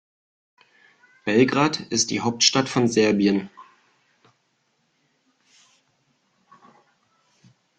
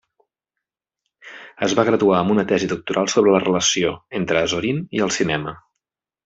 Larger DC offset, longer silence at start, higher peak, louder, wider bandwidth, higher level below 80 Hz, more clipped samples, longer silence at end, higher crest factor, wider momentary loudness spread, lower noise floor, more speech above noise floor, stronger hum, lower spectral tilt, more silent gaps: neither; about the same, 1.25 s vs 1.25 s; about the same, -2 dBFS vs -2 dBFS; about the same, -20 LUFS vs -19 LUFS; first, 10.5 kHz vs 8 kHz; second, -64 dBFS vs -56 dBFS; neither; first, 4.15 s vs 0.7 s; first, 24 dB vs 18 dB; about the same, 7 LU vs 9 LU; second, -70 dBFS vs -84 dBFS; second, 49 dB vs 65 dB; neither; about the same, -3.5 dB/octave vs -4 dB/octave; neither